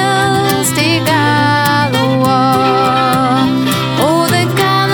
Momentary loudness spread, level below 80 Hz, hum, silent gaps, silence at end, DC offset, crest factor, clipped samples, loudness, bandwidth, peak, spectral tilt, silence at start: 2 LU; -46 dBFS; none; none; 0 s; under 0.1%; 12 dB; under 0.1%; -11 LUFS; over 20 kHz; 0 dBFS; -4.5 dB/octave; 0 s